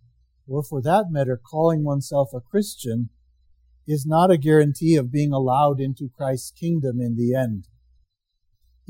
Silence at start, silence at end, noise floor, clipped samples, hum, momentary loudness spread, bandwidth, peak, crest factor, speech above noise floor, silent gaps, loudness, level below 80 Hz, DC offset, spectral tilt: 0.5 s; 1.25 s; -71 dBFS; under 0.1%; none; 11 LU; 17 kHz; -4 dBFS; 18 dB; 50 dB; none; -22 LUFS; -60 dBFS; under 0.1%; -7.5 dB/octave